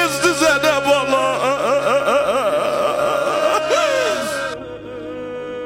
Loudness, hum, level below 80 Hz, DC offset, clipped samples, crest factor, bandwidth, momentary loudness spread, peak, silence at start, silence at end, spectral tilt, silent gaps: -17 LUFS; none; -50 dBFS; under 0.1%; under 0.1%; 14 dB; 17 kHz; 14 LU; -4 dBFS; 0 s; 0 s; -3 dB/octave; none